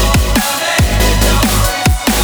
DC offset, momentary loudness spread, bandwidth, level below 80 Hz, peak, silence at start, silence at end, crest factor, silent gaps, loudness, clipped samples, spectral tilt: under 0.1%; 2 LU; over 20 kHz; -16 dBFS; 0 dBFS; 0 s; 0 s; 12 dB; none; -12 LUFS; under 0.1%; -4 dB/octave